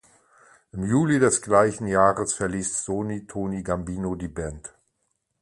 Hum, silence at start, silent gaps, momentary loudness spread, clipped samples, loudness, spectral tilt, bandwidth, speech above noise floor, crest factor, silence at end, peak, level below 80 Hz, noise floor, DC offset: none; 0.75 s; none; 14 LU; under 0.1%; -24 LUFS; -5.5 dB/octave; 11.5 kHz; 51 dB; 20 dB; 0.75 s; -4 dBFS; -48 dBFS; -75 dBFS; under 0.1%